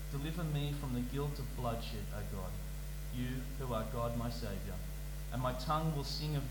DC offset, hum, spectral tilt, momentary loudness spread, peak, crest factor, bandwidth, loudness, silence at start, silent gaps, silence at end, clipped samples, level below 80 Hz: under 0.1%; none; -6 dB/octave; 8 LU; -24 dBFS; 16 dB; 19 kHz; -40 LUFS; 0 s; none; 0 s; under 0.1%; -44 dBFS